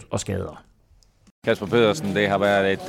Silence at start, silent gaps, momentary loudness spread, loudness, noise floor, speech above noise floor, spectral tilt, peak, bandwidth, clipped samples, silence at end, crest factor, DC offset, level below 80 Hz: 0 s; 1.31-1.42 s; 10 LU; -22 LUFS; -57 dBFS; 36 dB; -5 dB/octave; -8 dBFS; 15.5 kHz; under 0.1%; 0 s; 16 dB; under 0.1%; -54 dBFS